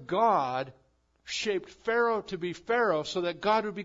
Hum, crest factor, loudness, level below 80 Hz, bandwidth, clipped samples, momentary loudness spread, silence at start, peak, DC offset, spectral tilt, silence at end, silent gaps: none; 16 dB; -29 LUFS; -66 dBFS; 7.8 kHz; under 0.1%; 10 LU; 0 s; -14 dBFS; under 0.1%; -4 dB/octave; 0 s; none